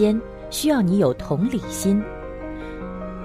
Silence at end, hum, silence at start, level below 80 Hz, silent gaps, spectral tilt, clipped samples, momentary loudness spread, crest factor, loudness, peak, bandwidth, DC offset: 0 s; none; 0 s; -40 dBFS; none; -6 dB/octave; under 0.1%; 14 LU; 16 dB; -23 LUFS; -6 dBFS; 15.5 kHz; under 0.1%